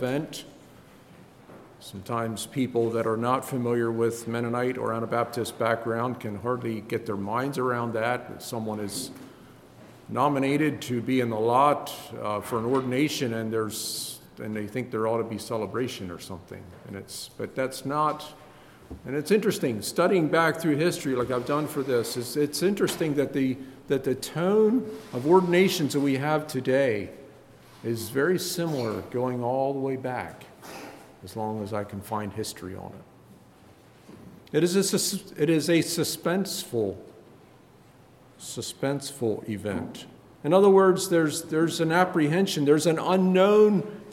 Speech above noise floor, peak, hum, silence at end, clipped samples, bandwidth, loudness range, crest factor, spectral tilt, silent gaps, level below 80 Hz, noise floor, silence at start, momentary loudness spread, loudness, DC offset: 28 dB; -6 dBFS; none; 0 s; under 0.1%; 17 kHz; 9 LU; 20 dB; -5 dB/octave; none; -64 dBFS; -54 dBFS; 0 s; 16 LU; -26 LUFS; under 0.1%